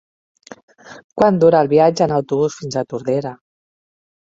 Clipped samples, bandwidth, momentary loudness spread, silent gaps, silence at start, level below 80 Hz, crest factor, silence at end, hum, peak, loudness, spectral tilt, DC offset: under 0.1%; 7.8 kHz; 12 LU; 1.04-1.09 s; 0.9 s; -56 dBFS; 16 dB; 1 s; none; -2 dBFS; -16 LUFS; -6.5 dB/octave; under 0.1%